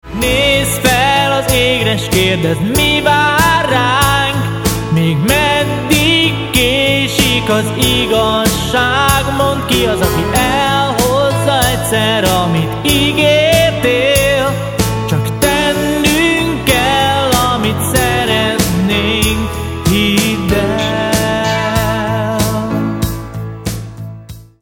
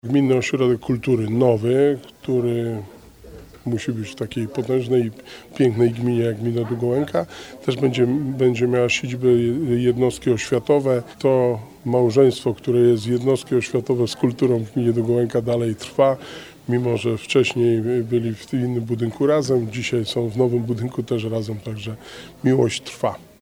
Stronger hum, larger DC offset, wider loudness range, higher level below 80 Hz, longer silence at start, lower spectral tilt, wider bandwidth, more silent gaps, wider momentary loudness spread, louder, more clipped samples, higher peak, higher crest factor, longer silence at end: neither; neither; about the same, 3 LU vs 4 LU; first, -28 dBFS vs -54 dBFS; about the same, 0.05 s vs 0.05 s; second, -4 dB/octave vs -6.5 dB/octave; first, 19.5 kHz vs 15.5 kHz; neither; second, 6 LU vs 10 LU; first, -12 LUFS vs -21 LUFS; neither; first, 0 dBFS vs -4 dBFS; about the same, 12 dB vs 16 dB; about the same, 0.2 s vs 0.2 s